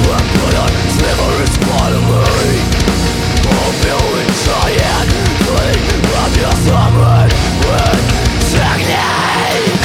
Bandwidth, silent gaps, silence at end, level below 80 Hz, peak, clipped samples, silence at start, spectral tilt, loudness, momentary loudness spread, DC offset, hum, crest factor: 16.5 kHz; none; 0 s; -18 dBFS; 0 dBFS; under 0.1%; 0 s; -5 dB/octave; -12 LUFS; 3 LU; under 0.1%; none; 10 dB